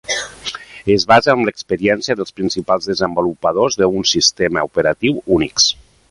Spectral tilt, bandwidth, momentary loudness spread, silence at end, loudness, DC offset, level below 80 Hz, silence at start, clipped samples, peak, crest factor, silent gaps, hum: -3 dB/octave; 11.5 kHz; 10 LU; 0.4 s; -16 LUFS; under 0.1%; -46 dBFS; 0.1 s; under 0.1%; 0 dBFS; 16 dB; none; none